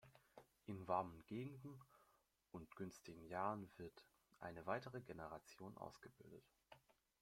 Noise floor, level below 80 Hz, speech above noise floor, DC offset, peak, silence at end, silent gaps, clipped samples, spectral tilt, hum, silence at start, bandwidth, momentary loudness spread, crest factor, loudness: -81 dBFS; -80 dBFS; 29 dB; under 0.1%; -28 dBFS; 0.45 s; none; under 0.1%; -6.5 dB/octave; none; 0.05 s; 16.5 kHz; 20 LU; 24 dB; -52 LUFS